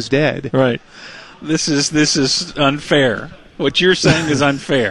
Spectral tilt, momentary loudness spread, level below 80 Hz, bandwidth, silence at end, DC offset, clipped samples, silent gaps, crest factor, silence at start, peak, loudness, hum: -4 dB/octave; 15 LU; -44 dBFS; 11 kHz; 0 s; 0.4%; under 0.1%; none; 16 dB; 0 s; 0 dBFS; -15 LUFS; none